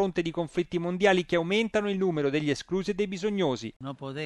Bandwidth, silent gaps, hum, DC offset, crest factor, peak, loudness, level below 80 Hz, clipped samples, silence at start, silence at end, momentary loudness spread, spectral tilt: 11.5 kHz; 3.76-3.80 s; none; under 0.1%; 18 dB; -10 dBFS; -28 LUFS; -58 dBFS; under 0.1%; 0 s; 0 s; 8 LU; -6 dB/octave